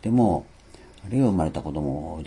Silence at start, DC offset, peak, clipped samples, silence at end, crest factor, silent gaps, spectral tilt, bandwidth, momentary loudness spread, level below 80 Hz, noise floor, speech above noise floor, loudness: 0.05 s; under 0.1%; -8 dBFS; under 0.1%; 0 s; 16 dB; none; -9 dB/octave; 11 kHz; 9 LU; -44 dBFS; -48 dBFS; 25 dB; -25 LUFS